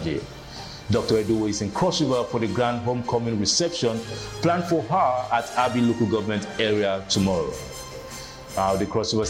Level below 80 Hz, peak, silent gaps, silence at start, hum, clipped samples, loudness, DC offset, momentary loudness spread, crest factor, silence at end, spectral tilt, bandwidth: -48 dBFS; -8 dBFS; none; 0 s; none; under 0.1%; -24 LUFS; under 0.1%; 14 LU; 16 dB; 0 s; -4.5 dB/octave; 16.5 kHz